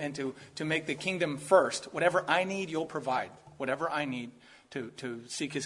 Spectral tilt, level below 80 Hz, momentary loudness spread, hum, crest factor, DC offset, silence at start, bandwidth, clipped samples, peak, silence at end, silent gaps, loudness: -4 dB/octave; -74 dBFS; 15 LU; none; 24 dB; under 0.1%; 0 s; 11.5 kHz; under 0.1%; -8 dBFS; 0 s; none; -31 LUFS